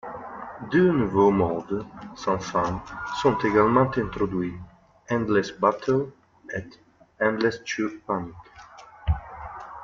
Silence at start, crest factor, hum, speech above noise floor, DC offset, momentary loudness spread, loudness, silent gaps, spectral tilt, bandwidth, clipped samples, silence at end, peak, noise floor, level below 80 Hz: 0.05 s; 20 dB; none; 23 dB; under 0.1%; 17 LU; -25 LUFS; none; -6.5 dB/octave; 7.4 kHz; under 0.1%; 0 s; -6 dBFS; -47 dBFS; -44 dBFS